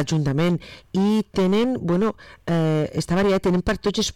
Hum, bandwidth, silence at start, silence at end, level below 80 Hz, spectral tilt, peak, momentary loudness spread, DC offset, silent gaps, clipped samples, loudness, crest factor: none; 14 kHz; 0 s; 0.05 s; -42 dBFS; -6 dB/octave; -14 dBFS; 6 LU; 0.4%; none; under 0.1%; -22 LUFS; 6 dB